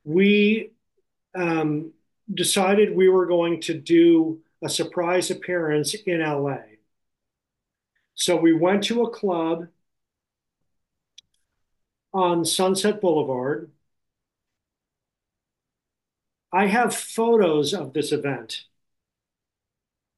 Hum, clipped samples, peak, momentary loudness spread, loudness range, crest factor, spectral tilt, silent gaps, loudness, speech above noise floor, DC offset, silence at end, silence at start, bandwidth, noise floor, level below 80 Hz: none; under 0.1%; -8 dBFS; 13 LU; 9 LU; 16 dB; -4.5 dB/octave; none; -22 LUFS; 66 dB; under 0.1%; 1.55 s; 0.05 s; 12 kHz; -87 dBFS; -72 dBFS